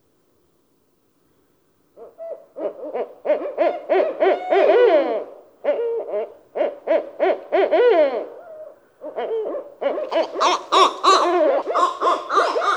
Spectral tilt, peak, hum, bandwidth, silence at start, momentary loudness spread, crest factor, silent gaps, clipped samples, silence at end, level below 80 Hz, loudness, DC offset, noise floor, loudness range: -1.5 dB/octave; -2 dBFS; none; 11.5 kHz; 2 s; 18 LU; 18 dB; none; under 0.1%; 0 s; -80 dBFS; -20 LUFS; under 0.1%; -64 dBFS; 8 LU